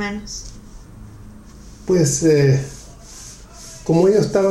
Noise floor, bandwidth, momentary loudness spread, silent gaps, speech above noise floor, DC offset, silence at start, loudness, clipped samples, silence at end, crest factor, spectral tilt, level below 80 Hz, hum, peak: -40 dBFS; 13 kHz; 23 LU; none; 24 dB; under 0.1%; 0 s; -17 LUFS; under 0.1%; 0 s; 16 dB; -6 dB/octave; -42 dBFS; none; -4 dBFS